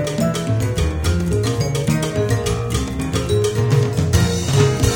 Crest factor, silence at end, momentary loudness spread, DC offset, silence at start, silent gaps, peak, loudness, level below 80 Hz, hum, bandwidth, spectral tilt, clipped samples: 16 dB; 0 s; 4 LU; under 0.1%; 0 s; none; -2 dBFS; -19 LUFS; -28 dBFS; none; 17.5 kHz; -5.5 dB/octave; under 0.1%